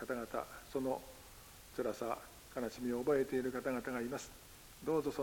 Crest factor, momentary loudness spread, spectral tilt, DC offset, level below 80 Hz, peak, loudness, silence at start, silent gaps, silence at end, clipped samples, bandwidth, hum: 18 dB; 20 LU; -5 dB/octave; under 0.1%; -64 dBFS; -22 dBFS; -40 LUFS; 0 s; none; 0 s; under 0.1%; 17 kHz; none